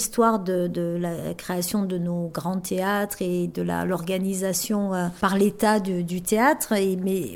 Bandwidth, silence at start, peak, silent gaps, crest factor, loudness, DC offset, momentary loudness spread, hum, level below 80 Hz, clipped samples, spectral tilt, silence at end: 18 kHz; 0 s; -6 dBFS; none; 18 dB; -24 LUFS; under 0.1%; 7 LU; none; -56 dBFS; under 0.1%; -5 dB/octave; 0 s